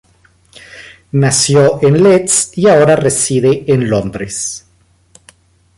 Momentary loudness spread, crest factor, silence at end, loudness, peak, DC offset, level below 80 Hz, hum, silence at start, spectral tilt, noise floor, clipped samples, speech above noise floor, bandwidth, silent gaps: 11 LU; 12 dB; 1.2 s; -11 LUFS; 0 dBFS; under 0.1%; -46 dBFS; none; 0.75 s; -4.5 dB/octave; -52 dBFS; under 0.1%; 42 dB; 11.5 kHz; none